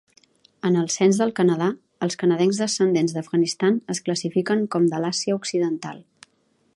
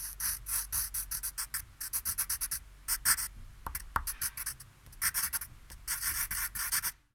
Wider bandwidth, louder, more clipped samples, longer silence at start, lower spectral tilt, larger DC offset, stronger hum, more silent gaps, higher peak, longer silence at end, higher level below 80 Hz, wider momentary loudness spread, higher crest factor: second, 11.5 kHz vs 19.5 kHz; first, -22 LUFS vs -33 LUFS; neither; first, 0.65 s vs 0 s; first, -5 dB/octave vs 1 dB/octave; neither; neither; neither; first, -6 dBFS vs -12 dBFS; first, 0.75 s vs 0.2 s; second, -72 dBFS vs -50 dBFS; about the same, 8 LU vs 10 LU; second, 16 dB vs 24 dB